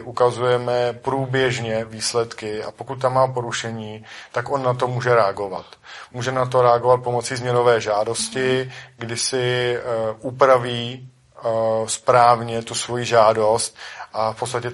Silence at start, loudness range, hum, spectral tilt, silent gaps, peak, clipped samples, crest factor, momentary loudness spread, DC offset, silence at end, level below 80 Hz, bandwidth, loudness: 0 s; 4 LU; none; -4 dB/octave; none; -2 dBFS; under 0.1%; 20 dB; 14 LU; under 0.1%; 0 s; -58 dBFS; 11.5 kHz; -20 LUFS